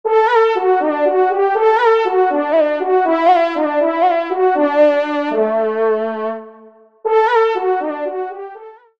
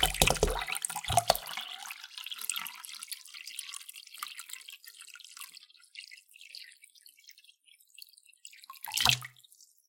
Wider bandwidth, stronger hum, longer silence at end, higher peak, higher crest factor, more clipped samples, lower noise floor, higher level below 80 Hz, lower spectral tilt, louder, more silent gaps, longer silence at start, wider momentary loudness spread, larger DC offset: second, 7.2 kHz vs 17 kHz; neither; second, 0.3 s vs 0.6 s; about the same, -2 dBFS vs -4 dBFS; second, 14 dB vs 32 dB; neither; second, -44 dBFS vs -62 dBFS; second, -70 dBFS vs -48 dBFS; first, -5.5 dB/octave vs -1.5 dB/octave; first, -15 LUFS vs -32 LUFS; neither; about the same, 0.05 s vs 0 s; second, 10 LU vs 25 LU; first, 0.2% vs under 0.1%